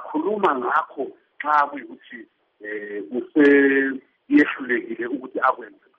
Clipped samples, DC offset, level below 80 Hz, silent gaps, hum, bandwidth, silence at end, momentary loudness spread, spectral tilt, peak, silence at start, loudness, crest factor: under 0.1%; under 0.1%; -72 dBFS; none; none; 5.8 kHz; 0.3 s; 20 LU; -3 dB/octave; -6 dBFS; 0 s; -21 LUFS; 16 dB